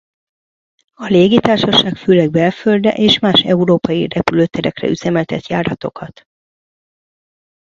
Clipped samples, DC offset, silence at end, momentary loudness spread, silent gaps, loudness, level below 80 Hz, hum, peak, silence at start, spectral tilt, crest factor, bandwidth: under 0.1%; under 0.1%; 1.6 s; 10 LU; none; -13 LUFS; -48 dBFS; none; 0 dBFS; 1 s; -6 dB/octave; 16 dB; 7.6 kHz